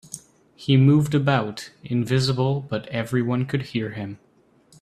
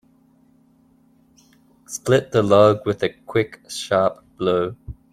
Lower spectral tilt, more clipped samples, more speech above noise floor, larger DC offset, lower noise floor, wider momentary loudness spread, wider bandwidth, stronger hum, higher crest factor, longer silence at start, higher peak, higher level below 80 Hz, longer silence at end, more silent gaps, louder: about the same, -6.5 dB/octave vs -5.5 dB/octave; neither; about the same, 35 dB vs 38 dB; neither; about the same, -57 dBFS vs -57 dBFS; first, 17 LU vs 14 LU; second, 13 kHz vs 15 kHz; neither; about the same, 18 dB vs 20 dB; second, 0.1 s vs 1.9 s; second, -6 dBFS vs -2 dBFS; second, -58 dBFS vs -52 dBFS; first, 0.65 s vs 0.2 s; neither; about the same, -22 LUFS vs -20 LUFS